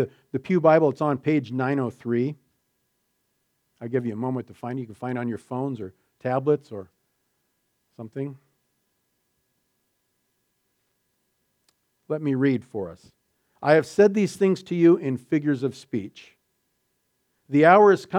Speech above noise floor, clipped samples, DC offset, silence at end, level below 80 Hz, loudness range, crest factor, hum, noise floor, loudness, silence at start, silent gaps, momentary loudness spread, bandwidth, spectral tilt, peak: 51 dB; under 0.1%; under 0.1%; 0 s; -72 dBFS; 20 LU; 22 dB; none; -74 dBFS; -23 LUFS; 0 s; none; 16 LU; 12 kHz; -7.5 dB/octave; -2 dBFS